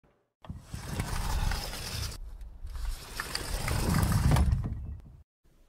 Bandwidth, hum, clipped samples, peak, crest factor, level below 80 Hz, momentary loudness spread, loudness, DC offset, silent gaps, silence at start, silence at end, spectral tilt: 16 kHz; none; under 0.1%; -12 dBFS; 20 dB; -36 dBFS; 20 LU; -32 LUFS; under 0.1%; none; 0.45 s; 0.45 s; -5 dB/octave